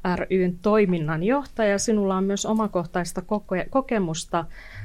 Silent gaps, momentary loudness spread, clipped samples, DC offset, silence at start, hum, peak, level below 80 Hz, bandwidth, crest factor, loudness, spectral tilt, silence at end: none; 8 LU; under 0.1%; under 0.1%; 0 s; none; -10 dBFS; -46 dBFS; 14.5 kHz; 14 dB; -24 LUFS; -5.5 dB/octave; 0 s